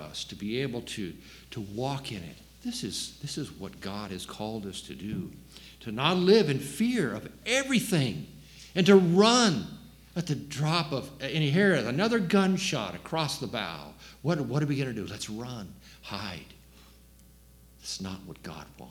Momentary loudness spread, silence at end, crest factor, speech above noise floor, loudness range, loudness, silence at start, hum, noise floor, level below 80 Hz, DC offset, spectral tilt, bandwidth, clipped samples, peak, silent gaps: 21 LU; 0 s; 22 dB; 27 dB; 12 LU; -28 LUFS; 0 s; none; -55 dBFS; -58 dBFS; under 0.1%; -5 dB/octave; 18 kHz; under 0.1%; -8 dBFS; none